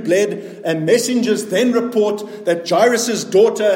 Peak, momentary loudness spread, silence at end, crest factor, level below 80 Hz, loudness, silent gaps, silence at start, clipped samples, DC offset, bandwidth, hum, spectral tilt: -2 dBFS; 7 LU; 0 s; 14 dB; -68 dBFS; -16 LUFS; none; 0 s; under 0.1%; under 0.1%; 17 kHz; none; -4 dB/octave